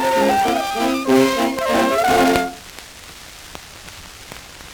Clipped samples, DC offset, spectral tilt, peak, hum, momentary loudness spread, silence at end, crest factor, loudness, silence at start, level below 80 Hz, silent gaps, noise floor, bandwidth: under 0.1%; under 0.1%; -3.5 dB/octave; 0 dBFS; none; 21 LU; 0 s; 20 dB; -17 LUFS; 0 s; -46 dBFS; none; -38 dBFS; over 20 kHz